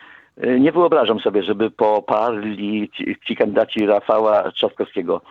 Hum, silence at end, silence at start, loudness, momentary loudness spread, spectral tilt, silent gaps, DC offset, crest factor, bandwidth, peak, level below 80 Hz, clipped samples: none; 0.1 s; 0.4 s; -18 LUFS; 9 LU; -7.5 dB/octave; none; under 0.1%; 16 dB; 6.2 kHz; -2 dBFS; -64 dBFS; under 0.1%